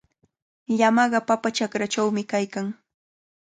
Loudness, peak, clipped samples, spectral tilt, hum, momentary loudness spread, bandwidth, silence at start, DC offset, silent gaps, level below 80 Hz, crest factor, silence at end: -23 LUFS; -6 dBFS; under 0.1%; -4.5 dB/octave; none; 12 LU; 9.4 kHz; 0.7 s; under 0.1%; none; -72 dBFS; 18 dB; 0.65 s